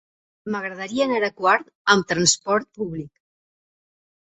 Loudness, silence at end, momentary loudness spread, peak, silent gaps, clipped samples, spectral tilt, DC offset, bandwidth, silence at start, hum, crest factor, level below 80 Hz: -21 LUFS; 1.25 s; 13 LU; -2 dBFS; 1.75-1.85 s; under 0.1%; -2.5 dB/octave; under 0.1%; 8.4 kHz; 0.45 s; none; 22 dB; -60 dBFS